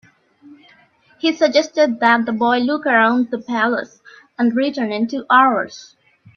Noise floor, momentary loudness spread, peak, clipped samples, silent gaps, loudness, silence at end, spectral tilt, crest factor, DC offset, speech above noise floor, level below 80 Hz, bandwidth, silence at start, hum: -53 dBFS; 9 LU; 0 dBFS; under 0.1%; none; -17 LUFS; 0.5 s; -4.5 dB/octave; 18 dB; under 0.1%; 36 dB; -68 dBFS; 7 kHz; 0.5 s; none